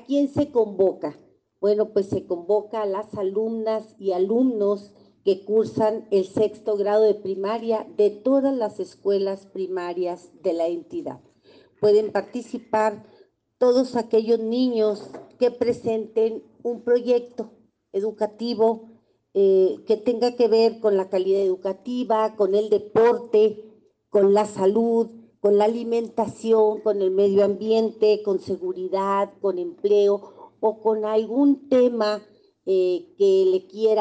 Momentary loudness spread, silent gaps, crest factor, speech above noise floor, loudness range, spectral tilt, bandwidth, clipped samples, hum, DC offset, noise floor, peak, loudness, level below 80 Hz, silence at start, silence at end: 10 LU; none; 14 dB; 33 dB; 4 LU; -6.5 dB/octave; 9 kHz; under 0.1%; none; under 0.1%; -54 dBFS; -8 dBFS; -22 LUFS; -68 dBFS; 0.1 s; 0 s